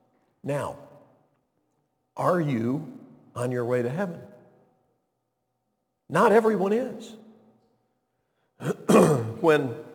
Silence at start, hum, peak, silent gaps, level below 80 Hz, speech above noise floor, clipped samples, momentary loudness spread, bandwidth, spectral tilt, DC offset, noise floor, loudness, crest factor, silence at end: 0.45 s; none; -4 dBFS; none; -70 dBFS; 54 dB; under 0.1%; 22 LU; 18 kHz; -6.5 dB/octave; under 0.1%; -78 dBFS; -24 LUFS; 22 dB; 0 s